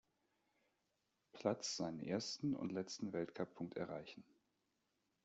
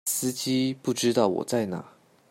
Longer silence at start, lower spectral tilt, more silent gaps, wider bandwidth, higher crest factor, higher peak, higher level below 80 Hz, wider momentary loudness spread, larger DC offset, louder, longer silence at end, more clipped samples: first, 1.35 s vs 0.05 s; about the same, -4.5 dB/octave vs -4 dB/octave; neither; second, 8.2 kHz vs 16.5 kHz; first, 24 dB vs 18 dB; second, -24 dBFS vs -8 dBFS; second, -82 dBFS vs -70 dBFS; first, 10 LU vs 7 LU; neither; second, -45 LUFS vs -26 LUFS; first, 1 s vs 0.4 s; neither